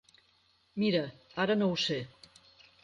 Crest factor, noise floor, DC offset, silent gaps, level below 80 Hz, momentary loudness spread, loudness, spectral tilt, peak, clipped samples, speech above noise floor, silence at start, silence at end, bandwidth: 18 dB; -69 dBFS; under 0.1%; none; -70 dBFS; 13 LU; -31 LUFS; -5.5 dB/octave; -16 dBFS; under 0.1%; 39 dB; 0.75 s; 0.75 s; 9.2 kHz